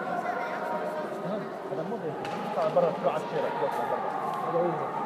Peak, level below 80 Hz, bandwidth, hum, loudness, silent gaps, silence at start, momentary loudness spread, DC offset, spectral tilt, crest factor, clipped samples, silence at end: -12 dBFS; -78 dBFS; 15 kHz; none; -30 LUFS; none; 0 s; 8 LU; under 0.1%; -6.5 dB/octave; 18 dB; under 0.1%; 0 s